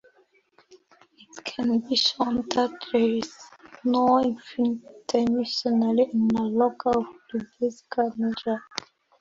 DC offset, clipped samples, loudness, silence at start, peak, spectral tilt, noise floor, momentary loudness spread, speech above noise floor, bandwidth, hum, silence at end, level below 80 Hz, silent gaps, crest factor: under 0.1%; under 0.1%; -25 LUFS; 1.35 s; -6 dBFS; -5 dB/octave; -63 dBFS; 12 LU; 39 dB; 7.6 kHz; none; 0.55 s; -62 dBFS; none; 20 dB